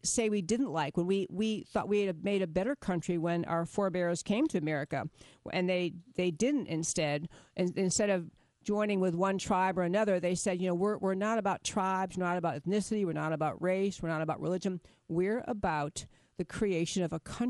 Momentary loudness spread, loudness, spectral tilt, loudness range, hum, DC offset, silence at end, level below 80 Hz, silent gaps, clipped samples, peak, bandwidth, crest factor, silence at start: 7 LU; -32 LUFS; -5 dB/octave; 3 LU; none; under 0.1%; 0 s; -60 dBFS; none; under 0.1%; -16 dBFS; 11.5 kHz; 16 dB; 0.05 s